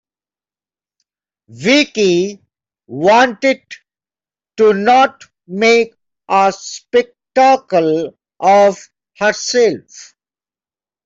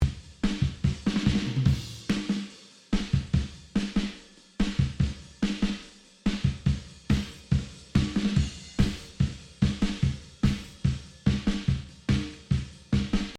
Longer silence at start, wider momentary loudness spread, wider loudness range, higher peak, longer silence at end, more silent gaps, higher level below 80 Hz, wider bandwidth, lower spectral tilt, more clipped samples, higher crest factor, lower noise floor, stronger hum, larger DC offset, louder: first, 1.55 s vs 0 s; first, 13 LU vs 6 LU; about the same, 2 LU vs 2 LU; first, -2 dBFS vs -10 dBFS; first, 1 s vs 0 s; neither; second, -62 dBFS vs -36 dBFS; second, 8 kHz vs 11.5 kHz; second, -4 dB/octave vs -6.5 dB/octave; neither; about the same, 14 dB vs 18 dB; first, under -90 dBFS vs -48 dBFS; neither; neither; first, -13 LUFS vs -29 LUFS